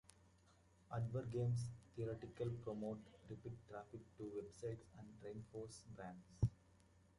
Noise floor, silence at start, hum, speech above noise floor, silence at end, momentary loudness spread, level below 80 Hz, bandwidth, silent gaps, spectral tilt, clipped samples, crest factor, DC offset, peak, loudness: -72 dBFS; 0.2 s; none; 25 dB; 0.2 s; 12 LU; -64 dBFS; 11.5 kHz; none; -7.5 dB/octave; under 0.1%; 22 dB; under 0.1%; -26 dBFS; -49 LUFS